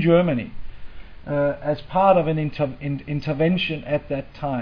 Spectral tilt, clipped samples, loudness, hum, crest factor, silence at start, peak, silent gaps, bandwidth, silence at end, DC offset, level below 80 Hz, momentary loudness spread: -9.5 dB/octave; under 0.1%; -22 LUFS; none; 18 dB; 0 s; -4 dBFS; none; 5.4 kHz; 0 s; under 0.1%; -42 dBFS; 11 LU